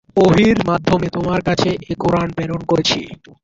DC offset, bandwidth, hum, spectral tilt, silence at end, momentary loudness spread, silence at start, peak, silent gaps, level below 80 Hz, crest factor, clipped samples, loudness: under 0.1%; 7.8 kHz; none; -6 dB/octave; 0.3 s; 9 LU; 0.15 s; -2 dBFS; none; -40 dBFS; 14 dB; under 0.1%; -17 LUFS